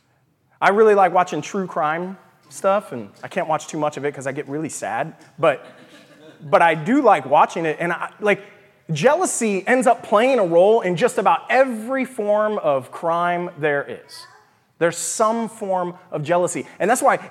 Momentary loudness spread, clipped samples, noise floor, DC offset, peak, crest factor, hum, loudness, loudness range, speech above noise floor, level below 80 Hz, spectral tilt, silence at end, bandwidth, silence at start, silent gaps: 12 LU; under 0.1%; -62 dBFS; under 0.1%; -2 dBFS; 18 dB; none; -19 LUFS; 7 LU; 43 dB; -76 dBFS; -4.5 dB/octave; 0 s; 15 kHz; 0.6 s; none